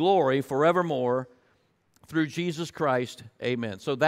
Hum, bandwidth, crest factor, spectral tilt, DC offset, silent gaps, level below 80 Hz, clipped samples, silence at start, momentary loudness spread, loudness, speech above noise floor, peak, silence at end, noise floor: none; 15.5 kHz; 18 dB; -6 dB/octave; under 0.1%; none; -70 dBFS; under 0.1%; 0 s; 9 LU; -27 LUFS; 42 dB; -10 dBFS; 0 s; -67 dBFS